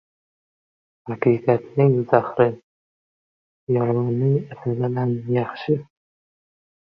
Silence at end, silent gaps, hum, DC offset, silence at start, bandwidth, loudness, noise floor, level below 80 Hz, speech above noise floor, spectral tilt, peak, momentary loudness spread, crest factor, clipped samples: 1.1 s; 2.63-3.67 s; none; under 0.1%; 1.05 s; 5.6 kHz; -21 LUFS; under -90 dBFS; -62 dBFS; over 70 dB; -11 dB/octave; -2 dBFS; 9 LU; 22 dB; under 0.1%